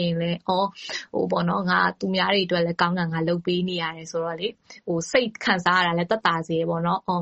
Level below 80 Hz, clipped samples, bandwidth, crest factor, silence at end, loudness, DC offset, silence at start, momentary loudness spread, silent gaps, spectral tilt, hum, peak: -62 dBFS; under 0.1%; 8.2 kHz; 22 dB; 0 s; -24 LUFS; under 0.1%; 0 s; 8 LU; none; -5 dB/octave; none; -2 dBFS